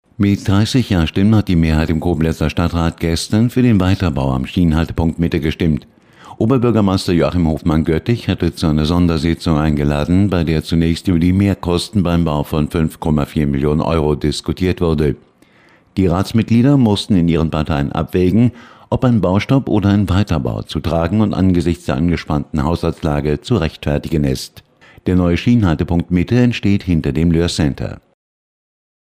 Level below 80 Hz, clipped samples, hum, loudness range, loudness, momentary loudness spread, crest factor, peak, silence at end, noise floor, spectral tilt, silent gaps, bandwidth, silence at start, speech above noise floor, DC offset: -32 dBFS; under 0.1%; none; 2 LU; -16 LUFS; 5 LU; 12 dB; -2 dBFS; 1.1 s; -50 dBFS; -7 dB/octave; none; 15.5 kHz; 0.2 s; 35 dB; 0.1%